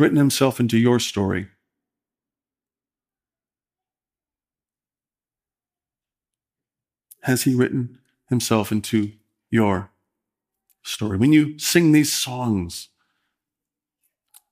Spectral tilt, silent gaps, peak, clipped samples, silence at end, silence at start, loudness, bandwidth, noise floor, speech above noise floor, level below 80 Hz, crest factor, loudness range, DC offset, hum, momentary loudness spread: -5 dB/octave; none; -4 dBFS; under 0.1%; 1.7 s; 0 s; -20 LUFS; 16 kHz; under -90 dBFS; over 71 dB; -64 dBFS; 20 dB; 7 LU; under 0.1%; none; 14 LU